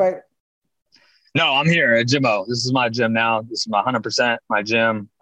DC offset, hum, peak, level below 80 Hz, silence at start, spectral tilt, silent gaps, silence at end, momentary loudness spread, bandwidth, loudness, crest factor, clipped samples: under 0.1%; none; -6 dBFS; -64 dBFS; 0 s; -4.5 dB/octave; 0.40-0.62 s; 0.15 s; 7 LU; 9.8 kHz; -18 LUFS; 14 dB; under 0.1%